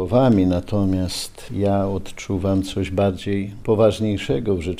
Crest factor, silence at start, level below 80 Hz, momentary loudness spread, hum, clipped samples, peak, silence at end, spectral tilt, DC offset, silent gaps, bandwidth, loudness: 16 dB; 0 s; -40 dBFS; 9 LU; none; under 0.1%; -4 dBFS; 0 s; -7 dB/octave; under 0.1%; none; 15.5 kHz; -21 LUFS